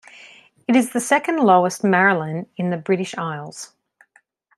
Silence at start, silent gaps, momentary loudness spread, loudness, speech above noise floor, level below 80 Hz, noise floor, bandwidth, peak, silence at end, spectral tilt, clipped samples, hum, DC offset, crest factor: 0.2 s; none; 16 LU; -19 LUFS; 40 dB; -70 dBFS; -59 dBFS; 13.5 kHz; -2 dBFS; 0.9 s; -5 dB/octave; under 0.1%; none; under 0.1%; 18 dB